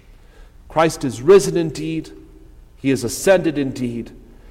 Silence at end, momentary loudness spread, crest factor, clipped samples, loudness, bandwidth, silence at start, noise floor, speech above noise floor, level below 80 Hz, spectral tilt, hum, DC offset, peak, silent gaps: 0.05 s; 15 LU; 16 dB; under 0.1%; -18 LUFS; 16 kHz; 0.4 s; -44 dBFS; 26 dB; -44 dBFS; -5 dB/octave; 60 Hz at -50 dBFS; under 0.1%; -2 dBFS; none